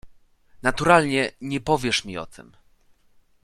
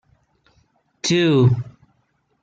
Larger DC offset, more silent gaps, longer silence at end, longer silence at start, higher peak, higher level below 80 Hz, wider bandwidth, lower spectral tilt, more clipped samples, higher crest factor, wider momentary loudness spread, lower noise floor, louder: neither; neither; first, 1 s vs 0.8 s; second, 0.05 s vs 1.05 s; first, -2 dBFS vs -6 dBFS; first, -48 dBFS vs -56 dBFS; first, 14 kHz vs 9 kHz; second, -4.5 dB/octave vs -6 dB/octave; neither; first, 22 dB vs 16 dB; first, 17 LU vs 12 LU; second, -59 dBFS vs -66 dBFS; second, -22 LUFS vs -18 LUFS